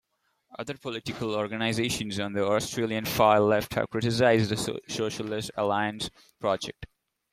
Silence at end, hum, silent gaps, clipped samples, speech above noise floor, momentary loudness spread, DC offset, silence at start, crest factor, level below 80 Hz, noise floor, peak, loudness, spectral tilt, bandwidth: 0.5 s; none; none; under 0.1%; 44 dB; 14 LU; under 0.1%; 0.55 s; 20 dB; -58 dBFS; -71 dBFS; -6 dBFS; -27 LUFS; -4.5 dB/octave; 16 kHz